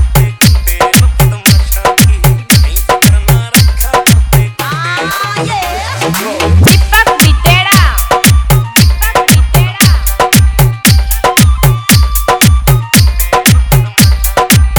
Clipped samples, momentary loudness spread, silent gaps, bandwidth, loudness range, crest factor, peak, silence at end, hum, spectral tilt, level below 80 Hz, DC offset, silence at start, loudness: 1%; 7 LU; none; over 20 kHz; 3 LU; 8 dB; 0 dBFS; 0 s; none; -4 dB/octave; -14 dBFS; under 0.1%; 0 s; -8 LUFS